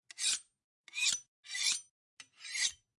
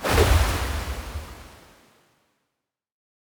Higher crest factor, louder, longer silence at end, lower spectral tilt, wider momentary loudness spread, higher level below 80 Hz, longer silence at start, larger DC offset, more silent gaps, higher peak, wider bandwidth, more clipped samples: about the same, 22 dB vs 22 dB; second, -34 LUFS vs -24 LUFS; second, 0.25 s vs 1.8 s; second, 4.5 dB/octave vs -4.5 dB/octave; second, 10 LU vs 21 LU; second, -80 dBFS vs -30 dBFS; first, 0.15 s vs 0 s; neither; first, 0.64-0.84 s, 1.28-1.43 s, 1.91-2.17 s vs none; second, -16 dBFS vs -4 dBFS; second, 12 kHz vs over 20 kHz; neither